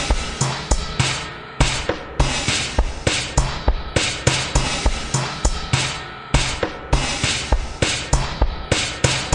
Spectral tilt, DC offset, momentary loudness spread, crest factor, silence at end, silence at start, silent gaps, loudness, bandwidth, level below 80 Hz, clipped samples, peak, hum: -3.5 dB/octave; under 0.1%; 5 LU; 20 dB; 0 s; 0 s; none; -21 LUFS; 11 kHz; -24 dBFS; under 0.1%; 0 dBFS; none